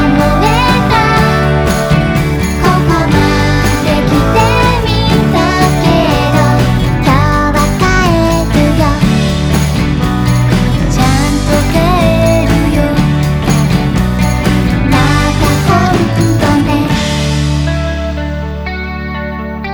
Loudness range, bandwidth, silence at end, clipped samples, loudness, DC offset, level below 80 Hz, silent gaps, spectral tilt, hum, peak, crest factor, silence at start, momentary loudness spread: 1 LU; over 20 kHz; 0 s; under 0.1%; -11 LUFS; under 0.1%; -18 dBFS; none; -6 dB/octave; none; 0 dBFS; 10 dB; 0 s; 4 LU